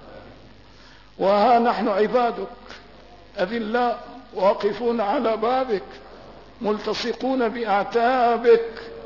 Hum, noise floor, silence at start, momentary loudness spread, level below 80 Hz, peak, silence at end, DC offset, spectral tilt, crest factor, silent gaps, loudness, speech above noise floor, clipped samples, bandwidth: none; -49 dBFS; 0 s; 17 LU; -54 dBFS; -6 dBFS; 0 s; 0.2%; -6 dB/octave; 16 dB; none; -22 LUFS; 28 dB; under 0.1%; 6 kHz